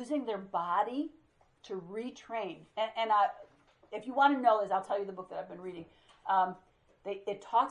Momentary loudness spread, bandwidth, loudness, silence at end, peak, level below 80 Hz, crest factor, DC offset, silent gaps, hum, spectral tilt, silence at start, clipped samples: 17 LU; 11 kHz; -33 LUFS; 0 s; -14 dBFS; -76 dBFS; 20 dB; under 0.1%; none; none; -5.5 dB/octave; 0 s; under 0.1%